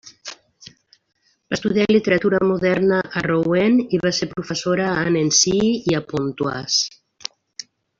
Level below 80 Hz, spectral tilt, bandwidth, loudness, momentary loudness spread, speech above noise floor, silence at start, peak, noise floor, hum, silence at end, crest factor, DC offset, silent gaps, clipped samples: -54 dBFS; -4 dB/octave; 7.8 kHz; -19 LUFS; 17 LU; 29 dB; 0.05 s; -2 dBFS; -47 dBFS; none; 0.35 s; 18 dB; under 0.1%; none; under 0.1%